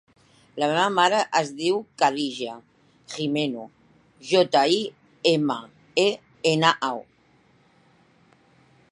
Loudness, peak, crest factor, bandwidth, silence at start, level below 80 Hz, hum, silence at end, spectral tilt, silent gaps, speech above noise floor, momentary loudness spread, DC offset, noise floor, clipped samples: -23 LUFS; -2 dBFS; 22 dB; 11.5 kHz; 0.55 s; -74 dBFS; none; 1.9 s; -4 dB/octave; none; 37 dB; 15 LU; under 0.1%; -60 dBFS; under 0.1%